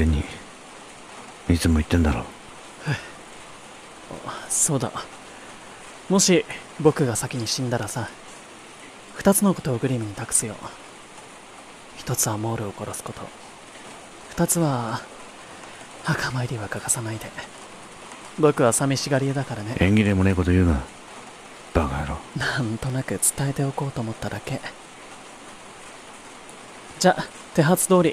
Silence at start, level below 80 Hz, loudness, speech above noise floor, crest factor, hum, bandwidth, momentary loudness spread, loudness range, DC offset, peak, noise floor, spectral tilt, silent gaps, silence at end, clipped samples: 0 s; -38 dBFS; -23 LUFS; 21 dB; 22 dB; none; 16 kHz; 22 LU; 7 LU; under 0.1%; -4 dBFS; -43 dBFS; -4.5 dB/octave; none; 0 s; under 0.1%